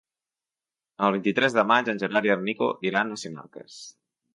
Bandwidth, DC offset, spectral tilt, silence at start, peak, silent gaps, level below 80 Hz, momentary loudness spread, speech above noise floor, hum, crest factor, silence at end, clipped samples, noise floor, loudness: 11 kHz; under 0.1%; -5 dB/octave; 1 s; -6 dBFS; none; -74 dBFS; 21 LU; over 65 dB; none; 22 dB; 0.45 s; under 0.1%; under -90 dBFS; -24 LUFS